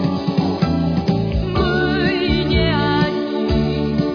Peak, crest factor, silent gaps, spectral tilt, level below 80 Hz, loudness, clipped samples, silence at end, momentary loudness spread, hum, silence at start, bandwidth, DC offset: -4 dBFS; 14 dB; none; -8 dB/octave; -28 dBFS; -18 LUFS; under 0.1%; 0 s; 3 LU; none; 0 s; 5.4 kHz; under 0.1%